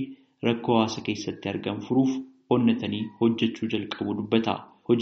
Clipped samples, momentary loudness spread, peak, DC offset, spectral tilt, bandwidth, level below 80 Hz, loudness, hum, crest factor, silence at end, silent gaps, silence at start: under 0.1%; 8 LU; -6 dBFS; under 0.1%; -5 dB/octave; 6.8 kHz; -66 dBFS; -26 LUFS; none; 18 dB; 0 s; none; 0 s